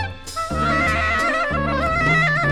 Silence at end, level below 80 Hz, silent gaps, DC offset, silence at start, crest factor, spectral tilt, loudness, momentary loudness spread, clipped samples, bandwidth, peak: 0 s; -32 dBFS; none; under 0.1%; 0 s; 12 dB; -5 dB/octave; -19 LUFS; 9 LU; under 0.1%; 15 kHz; -8 dBFS